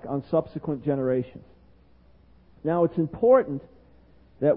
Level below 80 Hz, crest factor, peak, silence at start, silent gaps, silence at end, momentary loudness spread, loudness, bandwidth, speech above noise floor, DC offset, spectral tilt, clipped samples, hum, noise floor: -56 dBFS; 20 dB; -6 dBFS; 0.05 s; none; 0 s; 14 LU; -25 LUFS; 4.8 kHz; 32 dB; under 0.1%; -12.5 dB/octave; under 0.1%; none; -57 dBFS